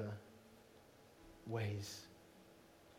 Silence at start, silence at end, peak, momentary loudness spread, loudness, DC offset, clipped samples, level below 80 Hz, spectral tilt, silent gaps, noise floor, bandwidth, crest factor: 0 s; 0 s; -30 dBFS; 21 LU; -47 LUFS; under 0.1%; under 0.1%; -76 dBFS; -5.5 dB/octave; none; -65 dBFS; 16 kHz; 20 dB